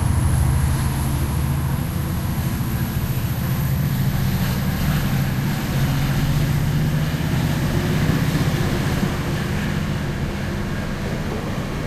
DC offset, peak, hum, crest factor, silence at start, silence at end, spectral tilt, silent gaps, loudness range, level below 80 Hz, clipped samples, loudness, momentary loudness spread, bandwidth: under 0.1%; -4 dBFS; none; 16 dB; 0 s; 0 s; -6 dB/octave; none; 2 LU; -28 dBFS; under 0.1%; -22 LUFS; 6 LU; 15.5 kHz